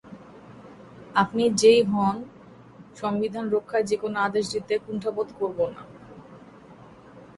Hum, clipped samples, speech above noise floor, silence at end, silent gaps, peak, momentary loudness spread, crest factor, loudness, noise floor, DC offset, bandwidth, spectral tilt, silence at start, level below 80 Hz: none; under 0.1%; 24 dB; 0.1 s; none; -6 dBFS; 27 LU; 20 dB; -24 LUFS; -48 dBFS; under 0.1%; 11.5 kHz; -4.5 dB/octave; 0.05 s; -62 dBFS